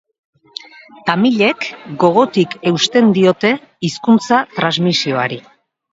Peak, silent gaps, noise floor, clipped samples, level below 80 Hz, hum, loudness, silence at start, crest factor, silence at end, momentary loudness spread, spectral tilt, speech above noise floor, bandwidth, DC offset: 0 dBFS; none; -36 dBFS; under 0.1%; -60 dBFS; none; -14 LUFS; 1.05 s; 16 dB; 0.55 s; 13 LU; -5 dB/octave; 21 dB; 7.8 kHz; under 0.1%